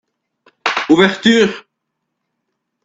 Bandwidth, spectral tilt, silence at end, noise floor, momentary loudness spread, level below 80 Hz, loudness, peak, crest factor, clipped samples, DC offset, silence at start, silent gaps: 8 kHz; -4.5 dB/octave; 1.25 s; -75 dBFS; 10 LU; -56 dBFS; -13 LUFS; 0 dBFS; 16 dB; under 0.1%; under 0.1%; 0.65 s; none